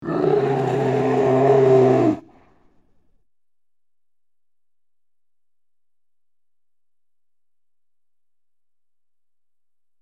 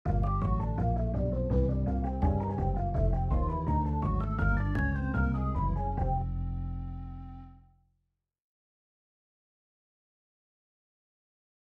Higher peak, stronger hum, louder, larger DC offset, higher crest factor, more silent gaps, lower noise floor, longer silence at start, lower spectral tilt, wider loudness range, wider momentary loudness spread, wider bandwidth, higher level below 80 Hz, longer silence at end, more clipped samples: first, -4 dBFS vs -16 dBFS; neither; first, -18 LUFS vs -31 LUFS; first, 0.1% vs under 0.1%; about the same, 20 dB vs 16 dB; neither; first, under -90 dBFS vs -81 dBFS; about the same, 0 s vs 0.05 s; second, -8.5 dB/octave vs -10.5 dB/octave; second, 9 LU vs 12 LU; about the same, 7 LU vs 9 LU; first, 8 kHz vs 4.5 kHz; second, -62 dBFS vs -34 dBFS; first, 7.8 s vs 4.1 s; neither